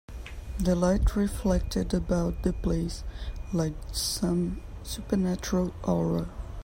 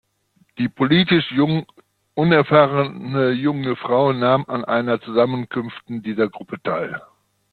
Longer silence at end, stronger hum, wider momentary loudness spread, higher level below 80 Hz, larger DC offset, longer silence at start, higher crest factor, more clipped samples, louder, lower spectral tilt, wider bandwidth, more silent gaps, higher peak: second, 0 s vs 0.55 s; neither; about the same, 13 LU vs 13 LU; first, -34 dBFS vs -58 dBFS; neither; second, 0.1 s vs 0.55 s; about the same, 16 dB vs 18 dB; neither; second, -29 LUFS vs -19 LUFS; second, -6 dB/octave vs -9 dB/octave; first, 16 kHz vs 4.8 kHz; neither; second, -12 dBFS vs -2 dBFS